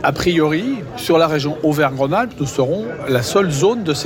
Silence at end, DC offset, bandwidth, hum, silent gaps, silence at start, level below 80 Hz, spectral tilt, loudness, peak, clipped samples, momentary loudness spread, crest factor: 0 s; under 0.1%; 17 kHz; none; none; 0 s; -44 dBFS; -5.5 dB/octave; -17 LUFS; -4 dBFS; under 0.1%; 6 LU; 12 dB